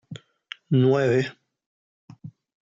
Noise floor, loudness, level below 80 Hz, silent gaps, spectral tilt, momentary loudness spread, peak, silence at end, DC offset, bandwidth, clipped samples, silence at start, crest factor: -45 dBFS; -22 LUFS; -70 dBFS; 1.66-2.08 s; -7.5 dB/octave; 25 LU; -10 dBFS; 0.35 s; under 0.1%; 7.6 kHz; under 0.1%; 0.1 s; 16 dB